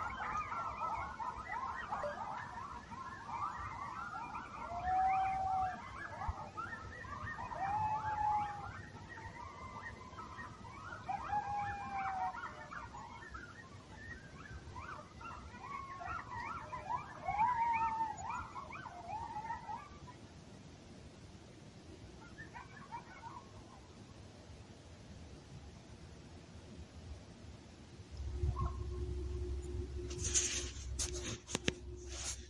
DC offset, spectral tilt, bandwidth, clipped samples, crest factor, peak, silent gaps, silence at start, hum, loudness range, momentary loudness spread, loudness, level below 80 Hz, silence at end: under 0.1%; -3.5 dB/octave; 11.5 kHz; under 0.1%; 30 dB; -12 dBFS; none; 0 s; none; 14 LU; 19 LU; -42 LUFS; -52 dBFS; 0 s